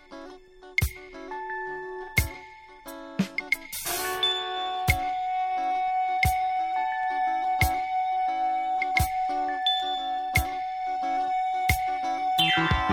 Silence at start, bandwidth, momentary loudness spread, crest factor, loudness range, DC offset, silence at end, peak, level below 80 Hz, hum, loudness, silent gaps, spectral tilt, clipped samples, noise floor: 0.1 s; 17.5 kHz; 11 LU; 20 dB; 5 LU; under 0.1%; 0 s; -6 dBFS; -40 dBFS; none; -27 LUFS; none; -3.5 dB/octave; under 0.1%; -47 dBFS